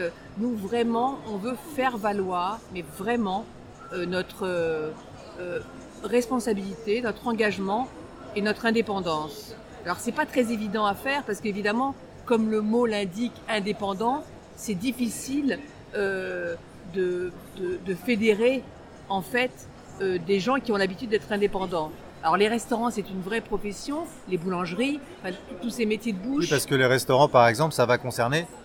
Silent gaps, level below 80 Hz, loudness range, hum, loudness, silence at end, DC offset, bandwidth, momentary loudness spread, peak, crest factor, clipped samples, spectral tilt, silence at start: none; -54 dBFS; 5 LU; none; -27 LUFS; 0 s; under 0.1%; 18 kHz; 13 LU; -4 dBFS; 22 dB; under 0.1%; -5 dB/octave; 0 s